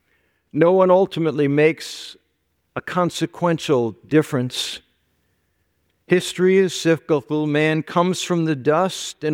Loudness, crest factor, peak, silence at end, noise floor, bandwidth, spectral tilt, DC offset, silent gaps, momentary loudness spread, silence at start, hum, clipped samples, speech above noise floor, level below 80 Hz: -19 LUFS; 18 dB; -2 dBFS; 0 s; -69 dBFS; 16.5 kHz; -5.5 dB/octave; under 0.1%; none; 12 LU; 0.55 s; none; under 0.1%; 51 dB; -64 dBFS